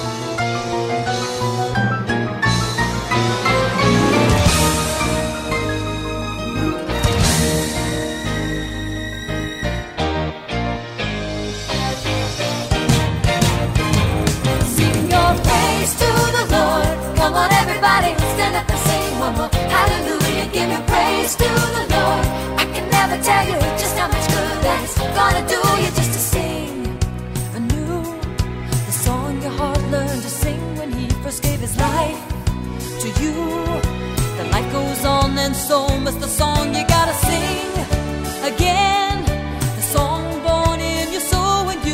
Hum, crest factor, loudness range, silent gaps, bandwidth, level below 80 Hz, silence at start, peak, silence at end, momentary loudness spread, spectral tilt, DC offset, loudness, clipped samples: none; 14 dB; 6 LU; none; 16.5 kHz; -28 dBFS; 0 s; -4 dBFS; 0 s; 9 LU; -4.5 dB/octave; under 0.1%; -18 LUFS; under 0.1%